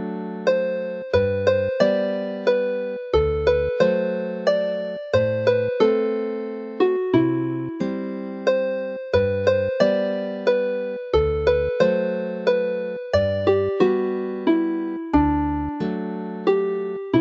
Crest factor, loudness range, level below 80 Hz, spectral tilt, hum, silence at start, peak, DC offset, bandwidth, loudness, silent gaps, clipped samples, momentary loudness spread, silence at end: 18 dB; 1 LU; -40 dBFS; -7.5 dB/octave; none; 0 s; -4 dBFS; under 0.1%; 7.2 kHz; -22 LUFS; none; under 0.1%; 7 LU; 0 s